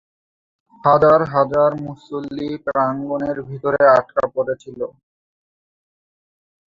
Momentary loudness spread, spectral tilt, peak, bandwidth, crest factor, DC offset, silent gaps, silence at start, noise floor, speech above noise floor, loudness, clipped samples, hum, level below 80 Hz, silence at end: 16 LU; -8 dB/octave; 0 dBFS; 7.4 kHz; 18 dB; under 0.1%; none; 0.85 s; under -90 dBFS; over 72 dB; -18 LUFS; under 0.1%; none; -54 dBFS; 1.8 s